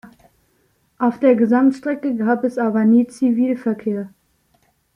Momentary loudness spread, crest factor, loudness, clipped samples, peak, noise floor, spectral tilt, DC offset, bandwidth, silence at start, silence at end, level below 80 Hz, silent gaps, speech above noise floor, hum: 9 LU; 16 dB; -18 LUFS; under 0.1%; -4 dBFS; -62 dBFS; -8 dB/octave; under 0.1%; 10.5 kHz; 0.05 s; 0.9 s; -64 dBFS; none; 46 dB; none